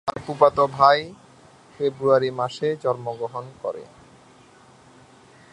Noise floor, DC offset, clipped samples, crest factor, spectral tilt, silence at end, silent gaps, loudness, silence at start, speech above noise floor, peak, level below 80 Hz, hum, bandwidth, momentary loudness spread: -51 dBFS; under 0.1%; under 0.1%; 22 dB; -6 dB/octave; 1.7 s; none; -22 LUFS; 0.05 s; 30 dB; -2 dBFS; -62 dBFS; none; 11 kHz; 15 LU